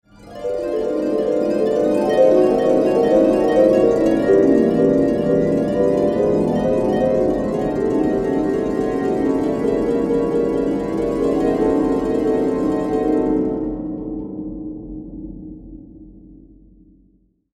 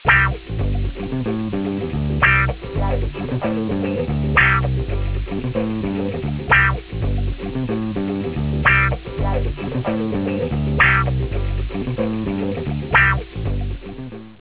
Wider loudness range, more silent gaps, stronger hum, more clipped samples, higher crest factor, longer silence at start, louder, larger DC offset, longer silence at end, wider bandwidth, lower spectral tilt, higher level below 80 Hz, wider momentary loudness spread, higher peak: first, 10 LU vs 2 LU; neither; neither; neither; about the same, 16 dB vs 18 dB; first, 0.2 s vs 0 s; about the same, -18 LUFS vs -20 LUFS; second, under 0.1% vs 0.2%; first, 1.2 s vs 0.05 s; first, 12 kHz vs 4 kHz; second, -8 dB/octave vs -10 dB/octave; second, -42 dBFS vs -28 dBFS; first, 14 LU vs 11 LU; about the same, -2 dBFS vs -2 dBFS